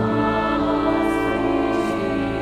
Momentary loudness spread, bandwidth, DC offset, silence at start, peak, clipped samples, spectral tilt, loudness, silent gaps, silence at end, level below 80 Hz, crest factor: 2 LU; 13.5 kHz; under 0.1%; 0 s; -8 dBFS; under 0.1%; -7 dB/octave; -21 LUFS; none; 0 s; -38 dBFS; 12 dB